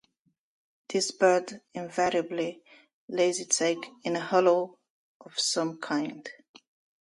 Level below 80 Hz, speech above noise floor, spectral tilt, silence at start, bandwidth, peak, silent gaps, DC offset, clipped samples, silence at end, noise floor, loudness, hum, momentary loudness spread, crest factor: -76 dBFS; 47 dB; -3 dB/octave; 0.9 s; 11.5 kHz; -8 dBFS; 2.93-3.08 s, 4.90-5.20 s; under 0.1%; under 0.1%; 0.7 s; -75 dBFS; -28 LUFS; none; 13 LU; 22 dB